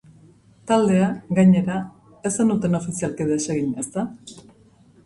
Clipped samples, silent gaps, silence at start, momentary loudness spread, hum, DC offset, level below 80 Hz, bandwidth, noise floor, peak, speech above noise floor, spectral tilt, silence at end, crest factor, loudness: under 0.1%; none; 0.65 s; 16 LU; none; under 0.1%; -56 dBFS; 11.5 kHz; -53 dBFS; -6 dBFS; 33 dB; -6.5 dB/octave; 0.65 s; 16 dB; -21 LUFS